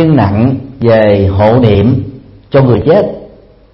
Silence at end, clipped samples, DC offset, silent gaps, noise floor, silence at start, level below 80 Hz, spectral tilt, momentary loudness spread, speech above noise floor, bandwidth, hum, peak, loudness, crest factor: 0.45 s; 0.3%; under 0.1%; none; -37 dBFS; 0 s; -34 dBFS; -10.5 dB/octave; 9 LU; 29 dB; 5.8 kHz; none; 0 dBFS; -9 LUFS; 8 dB